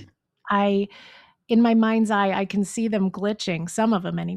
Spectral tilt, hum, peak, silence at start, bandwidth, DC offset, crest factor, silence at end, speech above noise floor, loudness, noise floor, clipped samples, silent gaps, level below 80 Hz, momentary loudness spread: -6 dB/octave; none; -8 dBFS; 0 s; 12 kHz; under 0.1%; 14 dB; 0 s; 23 dB; -22 LUFS; -45 dBFS; under 0.1%; none; -64 dBFS; 8 LU